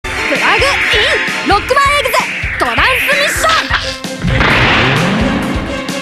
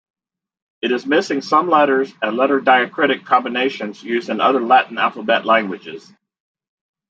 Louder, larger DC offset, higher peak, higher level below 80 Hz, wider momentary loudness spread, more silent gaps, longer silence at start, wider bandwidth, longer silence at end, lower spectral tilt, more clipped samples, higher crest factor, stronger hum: first, -11 LUFS vs -17 LUFS; neither; about the same, 0 dBFS vs -2 dBFS; first, -26 dBFS vs -74 dBFS; second, 7 LU vs 11 LU; neither; second, 0.05 s vs 0.85 s; first, 15 kHz vs 7.8 kHz; second, 0 s vs 1.1 s; about the same, -3.5 dB/octave vs -4.5 dB/octave; neither; about the same, 12 dB vs 16 dB; neither